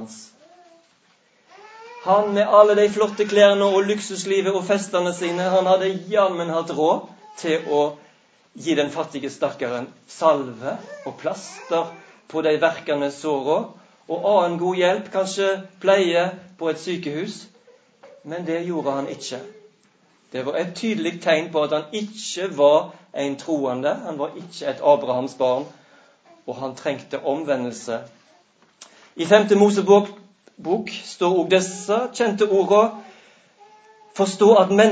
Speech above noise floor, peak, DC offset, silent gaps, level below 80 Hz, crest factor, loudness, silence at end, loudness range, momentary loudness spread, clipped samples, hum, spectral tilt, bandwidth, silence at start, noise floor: 40 dB; 0 dBFS; under 0.1%; none; -74 dBFS; 22 dB; -21 LUFS; 0 s; 9 LU; 15 LU; under 0.1%; none; -4.5 dB/octave; 8 kHz; 0 s; -60 dBFS